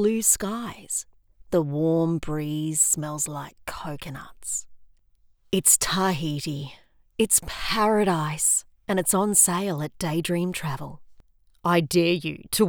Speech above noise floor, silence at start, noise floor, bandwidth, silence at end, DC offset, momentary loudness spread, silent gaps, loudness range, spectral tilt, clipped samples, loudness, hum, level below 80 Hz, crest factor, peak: 35 dB; 0 s; -60 dBFS; over 20 kHz; 0 s; under 0.1%; 16 LU; none; 4 LU; -3.5 dB/octave; under 0.1%; -23 LUFS; none; -50 dBFS; 22 dB; -4 dBFS